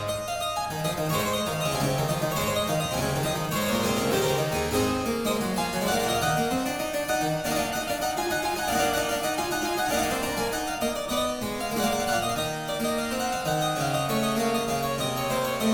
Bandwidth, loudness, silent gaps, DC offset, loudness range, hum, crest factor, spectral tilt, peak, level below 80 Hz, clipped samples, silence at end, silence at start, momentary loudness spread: 19 kHz; -26 LUFS; none; under 0.1%; 1 LU; none; 14 dB; -4 dB/octave; -12 dBFS; -48 dBFS; under 0.1%; 0 s; 0 s; 4 LU